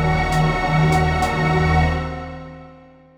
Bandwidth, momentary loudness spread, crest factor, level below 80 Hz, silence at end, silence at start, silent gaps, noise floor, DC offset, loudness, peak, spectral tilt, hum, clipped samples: 12.5 kHz; 16 LU; 14 dB; -28 dBFS; 0.4 s; 0 s; none; -45 dBFS; under 0.1%; -18 LUFS; -6 dBFS; -6.5 dB/octave; none; under 0.1%